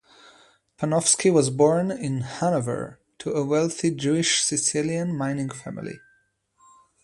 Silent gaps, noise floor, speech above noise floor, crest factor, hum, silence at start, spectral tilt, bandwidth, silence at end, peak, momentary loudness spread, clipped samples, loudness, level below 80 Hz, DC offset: none; -66 dBFS; 43 dB; 18 dB; none; 0.8 s; -4 dB/octave; 11.5 kHz; 1.05 s; -6 dBFS; 16 LU; under 0.1%; -23 LUFS; -62 dBFS; under 0.1%